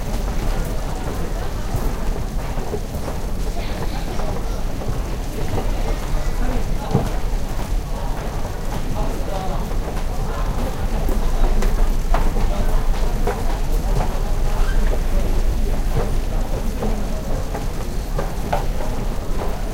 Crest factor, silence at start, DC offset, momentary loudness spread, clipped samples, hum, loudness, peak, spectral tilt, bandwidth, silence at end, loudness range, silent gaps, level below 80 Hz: 18 dB; 0 s; under 0.1%; 5 LU; under 0.1%; none; -25 LUFS; -2 dBFS; -6 dB/octave; 16 kHz; 0 s; 3 LU; none; -20 dBFS